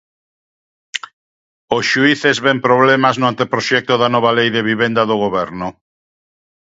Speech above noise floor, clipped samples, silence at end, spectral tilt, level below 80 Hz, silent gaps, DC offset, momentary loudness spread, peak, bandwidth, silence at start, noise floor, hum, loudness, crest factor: over 76 dB; under 0.1%; 1.05 s; -4.5 dB/octave; -56 dBFS; 1.13-1.68 s; under 0.1%; 14 LU; 0 dBFS; 8 kHz; 0.95 s; under -90 dBFS; none; -14 LUFS; 16 dB